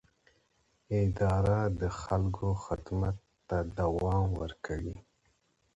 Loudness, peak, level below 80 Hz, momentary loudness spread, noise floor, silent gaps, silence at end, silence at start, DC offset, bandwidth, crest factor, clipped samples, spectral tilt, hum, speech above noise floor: -32 LUFS; -16 dBFS; -44 dBFS; 9 LU; -73 dBFS; none; 0.75 s; 0.9 s; under 0.1%; 8 kHz; 16 dB; under 0.1%; -8 dB/octave; none; 42 dB